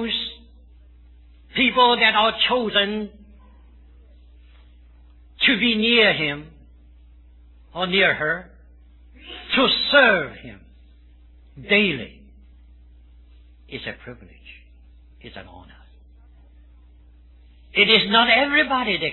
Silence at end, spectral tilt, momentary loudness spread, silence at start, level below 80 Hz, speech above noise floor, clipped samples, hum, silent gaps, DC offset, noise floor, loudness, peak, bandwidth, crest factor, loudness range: 0 s; -6.5 dB/octave; 23 LU; 0 s; -48 dBFS; 29 dB; under 0.1%; none; none; under 0.1%; -49 dBFS; -18 LUFS; -2 dBFS; 4.3 kHz; 22 dB; 20 LU